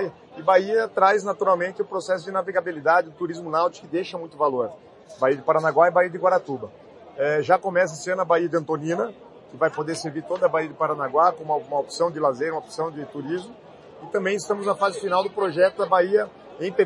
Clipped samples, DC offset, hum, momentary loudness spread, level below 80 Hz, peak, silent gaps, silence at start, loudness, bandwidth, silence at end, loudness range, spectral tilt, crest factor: under 0.1%; under 0.1%; none; 11 LU; -72 dBFS; -2 dBFS; none; 0 s; -23 LUFS; 11.5 kHz; 0 s; 4 LU; -5 dB/octave; 20 dB